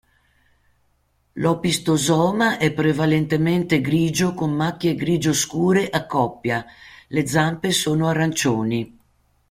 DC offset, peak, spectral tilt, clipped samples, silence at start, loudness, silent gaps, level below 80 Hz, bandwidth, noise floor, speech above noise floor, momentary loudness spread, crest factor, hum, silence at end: under 0.1%; -2 dBFS; -5 dB/octave; under 0.1%; 1.35 s; -20 LUFS; none; -52 dBFS; 16 kHz; -65 dBFS; 45 dB; 6 LU; 18 dB; none; 0.6 s